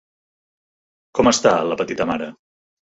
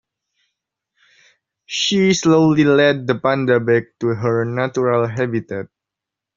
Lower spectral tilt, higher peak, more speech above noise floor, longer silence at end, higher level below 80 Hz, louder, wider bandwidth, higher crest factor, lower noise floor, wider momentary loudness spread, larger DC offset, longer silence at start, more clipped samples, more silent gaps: about the same, -3.5 dB/octave vs -4.5 dB/octave; about the same, -2 dBFS vs -2 dBFS; first, over 72 dB vs 68 dB; about the same, 0.6 s vs 0.7 s; first, -50 dBFS vs -58 dBFS; about the same, -19 LUFS vs -17 LUFS; about the same, 8.2 kHz vs 7.6 kHz; about the same, 20 dB vs 16 dB; first, under -90 dBFS vs -85 dBFS; about the same, 12 LU vs 11 LU; neither; second, 1.15 s vs 1.7 s; neither; neither